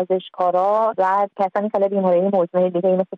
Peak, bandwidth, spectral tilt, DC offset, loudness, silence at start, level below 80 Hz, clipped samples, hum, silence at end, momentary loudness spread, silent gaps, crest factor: -8 dBFS; 5.8 kHz; -9 dB/octave; under 0.1%; -19 LUFS; 0 s; -70 dBFS; under 0.1%; none; 0 s; 3 LU; none; 12 dB